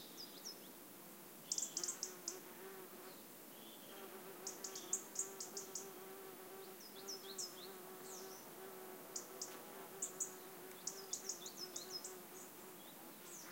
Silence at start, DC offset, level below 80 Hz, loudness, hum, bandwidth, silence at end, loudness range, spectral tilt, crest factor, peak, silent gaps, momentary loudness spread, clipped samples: 0 s; under 0.1%; under -90 dBFS; -48 LUFS; none; 17 kHz; 0 s; 3 LU; -1 dB/octave; 26 dB; -26 dBFS; none; 12 LU; under 0.1%